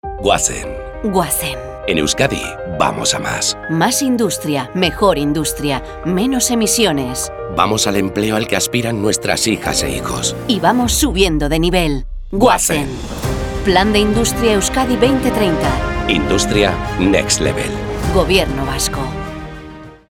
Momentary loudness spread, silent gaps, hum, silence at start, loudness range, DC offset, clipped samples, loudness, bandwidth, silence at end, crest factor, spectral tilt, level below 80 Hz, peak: 9 LU; none; none; 0.05 s; 2 LU; under 0.1%; under 0.1%; -16 LUFS; 19 kHz; 0.15 s; 16 dB; -3.5 dB/octave; -28 dBFS; 0 dBFS